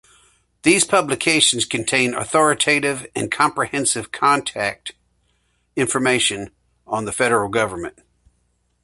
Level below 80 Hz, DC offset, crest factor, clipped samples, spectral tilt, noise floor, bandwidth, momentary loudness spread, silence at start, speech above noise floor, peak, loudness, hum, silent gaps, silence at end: -54 dBFS; under 0.1%; 20 dB; under 0.1%; -2.5 dB/octave; -66 dBFS; 12 kHz; 13 LU; 0.65 s; 47 dB; 0 dBFS; -18 LUFS; 60 Hz at -55 dBFS; none; 0.95 s